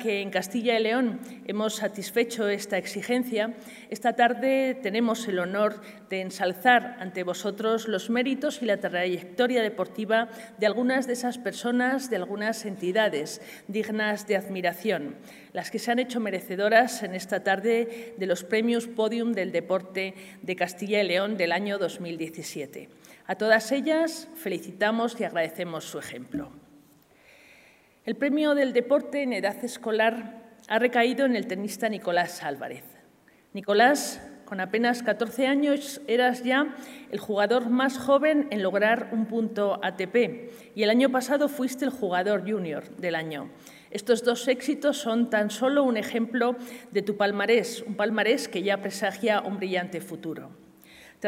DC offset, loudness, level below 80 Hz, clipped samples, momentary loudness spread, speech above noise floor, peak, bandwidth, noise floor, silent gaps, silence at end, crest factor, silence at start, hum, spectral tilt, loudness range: under 0.1%; -26 LUFS; -74 dBFS; under 0.1%; 13 LU; 32 dB; -6 dBFS; 16 kHz; -59 dBFS; none; 0 s; 22 dB; 0 s; none; -4.5 dB/octave; 4 LU